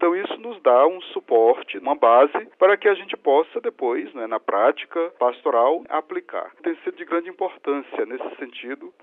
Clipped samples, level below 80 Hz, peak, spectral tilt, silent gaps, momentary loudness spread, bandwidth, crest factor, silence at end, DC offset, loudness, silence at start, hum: under 0.1%; -78 dBFS; -4 dBFS; -6.5 dB/octave; none; 14 LU; 4 kHz; 18 dB; 0.15 s; under 0.1%; -21 LUFS; 0 s; none